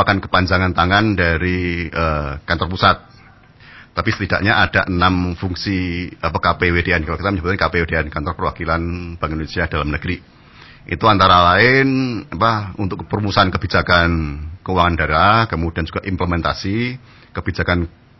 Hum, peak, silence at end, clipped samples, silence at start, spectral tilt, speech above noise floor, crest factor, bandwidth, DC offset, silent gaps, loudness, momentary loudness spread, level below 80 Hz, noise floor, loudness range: none; 0 dBFS; 0.3 s; under 0.1%; 0 s; -7 dB/octave; 28 dB; 18 dB; 6 kHz; 0.1%; none; -17 LUFS; 11 LU; -30 dBFS; -45 dBFS; 5 LU